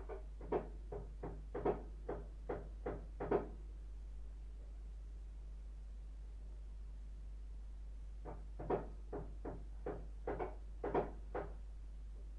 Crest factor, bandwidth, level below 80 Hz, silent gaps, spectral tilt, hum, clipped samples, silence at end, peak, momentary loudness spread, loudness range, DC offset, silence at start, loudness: 22 dB; 6.8 kHz; -50 dBFS; none; -8.5 dB/octave; none; under 0.1%; 0 s; -22 dBFS; 13 LU; 9 LU; under 0.1%; 0 s; -47 LUFS